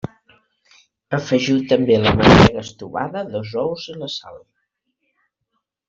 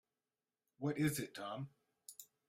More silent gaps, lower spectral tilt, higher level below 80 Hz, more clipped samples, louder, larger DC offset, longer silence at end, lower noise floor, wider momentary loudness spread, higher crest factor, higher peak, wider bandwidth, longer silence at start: neither; about the same, -6 dB/octave vs -5.5 dB/octave; first, -38 dBFS vs -74 dBFS; neither; first, -17 LUFS vs -41 LUFS; neither; first, 1.5 s vs 0.25 s; second, -75 dBFS vs under -90 dBFS; about the same, 18 LU vs 18 LU; about the same, 18 dB vs 22 dB; first, -2 dBFS vs -24 dBFS; second, 7.8 kHz vs 16 kHz; first, 1.1 s vs 0.8 s